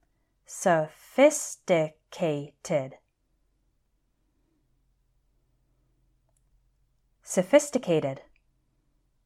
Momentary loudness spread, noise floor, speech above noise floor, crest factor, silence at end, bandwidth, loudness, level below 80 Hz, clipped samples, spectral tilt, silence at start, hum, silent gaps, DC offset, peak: 13 LU; -72 dBFS; 47 dB; 22 dB; 1.1 s; 15 kHz; -26 LUFS; -70 dBFS; under 0.1%; -4.5 dB/octave; 0.5 s; none; none; under 0.1%; -8 dBFS